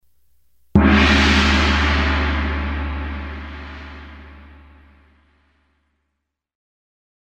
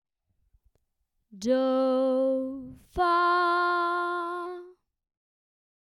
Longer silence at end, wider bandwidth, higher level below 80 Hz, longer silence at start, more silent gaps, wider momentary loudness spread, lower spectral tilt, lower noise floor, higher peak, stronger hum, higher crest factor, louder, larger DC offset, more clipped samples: first, 2.9 s vs 1.2 s; second, 8.6 kHz vs 11.5 kHz; first, -26 dBFS vs -58 dBFS; second, 0.75 s vs 1.35 s; neither; first, 22 LU vs 15 LU; about the same, -5.5 dB/octave vs -4.5 dB/octave; about the same, -77 dBFS vs -77 dBFS; first, -2 dBFS vs -14 dBFS; neither; first, 20 dB vs 14 dB; first, -17 LUFS vs -26 LUFS; neither; neither